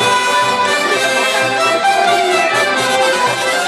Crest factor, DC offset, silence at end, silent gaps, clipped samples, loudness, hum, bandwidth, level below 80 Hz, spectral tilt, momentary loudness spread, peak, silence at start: 12 dB; under 0.1%; 0 s; none; under 0.1%; -13 LUFS; none; 15 kHz; -58 dBFS; -1.5 dB/octave; 1 LU; -2 dBFS; 0 s